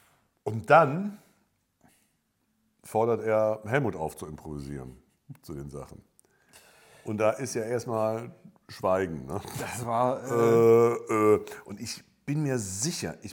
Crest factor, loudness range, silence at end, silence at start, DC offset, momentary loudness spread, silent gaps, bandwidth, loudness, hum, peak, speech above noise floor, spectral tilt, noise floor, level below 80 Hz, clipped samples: 22 dB; 10 LU; 0 s; 0.45 s; under 0.1%; 21 LU; none; 17.5 kHz; -27 LUFS; none; -6 dBFS; 47 dB; -5.5 dB/octave; -74 dBFS; -60 dBFS; under 0.1%